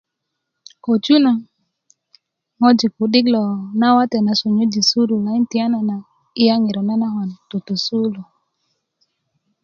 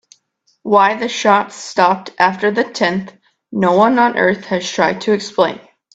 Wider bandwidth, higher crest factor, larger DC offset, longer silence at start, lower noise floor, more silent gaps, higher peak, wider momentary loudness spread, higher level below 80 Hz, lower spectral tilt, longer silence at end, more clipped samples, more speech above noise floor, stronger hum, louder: second, 7.2 kHz vs 9 kHz; about the same, 18 dB vs 16 dB; neither; first, 0.85 s vs 0.65 s; first, -77 dBFS vs -62 dBFS; neither; about the same, 0 dBFS vs 0 dBFS; about the same, 10 LU vs 9 LU; about the same, -64 dBFS vs -60 dBFS; about the same, -5 dB/octave vs -4.5 dB/octave; first, 1.4 s vs 0.35 s; neither; first, 61 dB vs 47 dB; neither; about the same, -17 LUFS vs -15 LUFS